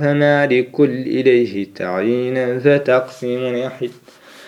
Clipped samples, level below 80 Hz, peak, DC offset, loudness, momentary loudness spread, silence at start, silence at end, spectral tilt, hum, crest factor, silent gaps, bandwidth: under 0.1%; -68 dBFS; 0 dBFS; under 0.1%; -17 LUFS; 10 LU; 0 s; 0 s; -7.5 dB/octave; none; 16 dB; none; 11.5 kHz